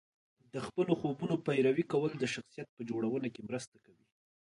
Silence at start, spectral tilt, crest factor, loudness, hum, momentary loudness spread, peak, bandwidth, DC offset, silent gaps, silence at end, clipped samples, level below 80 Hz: 0.55 s; -6.5 dB/octave; 18 dB; -35 LUFS; none; 14 LU; -16 dBFS; 11 kHz; under 0.1%; 2.69-2.77 s; 0.95 s; under 0.1%; -74 dBFS